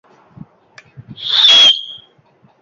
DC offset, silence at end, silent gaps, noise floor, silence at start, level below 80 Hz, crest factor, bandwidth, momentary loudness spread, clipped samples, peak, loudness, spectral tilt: under 0.1%; 0.65 s; none; -52 dBFS; 1.1 s; -60 dBFS; 16 dB; 7.6 kHz; 21 LU; under 0.1%; 0 dBFS; -7 LUFS; 0 dB/octave